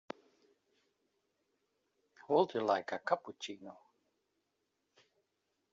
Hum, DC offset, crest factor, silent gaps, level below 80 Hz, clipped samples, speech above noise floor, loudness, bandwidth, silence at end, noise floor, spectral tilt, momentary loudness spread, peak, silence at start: none; under 0.1%; 26 dB; none; -88 dBFS; under 0.1%; 49 dB; -35 LUFS; 7.6 kHz; 2 s; -84 dBFS; -3 dB/octave; 20 LU; -16 dBFS; 2.3 s